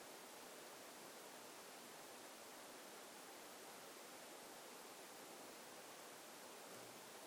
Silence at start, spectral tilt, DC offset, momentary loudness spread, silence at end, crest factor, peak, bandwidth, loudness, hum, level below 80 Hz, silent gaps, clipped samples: 0 s; -1.5 dB/octave; under 0.1%; 0 LU; 0 s; 14 dB; -44 dBFS; 19.5 kHz; -56 LUFS; none; under -90 dBFS; none; under 0.1%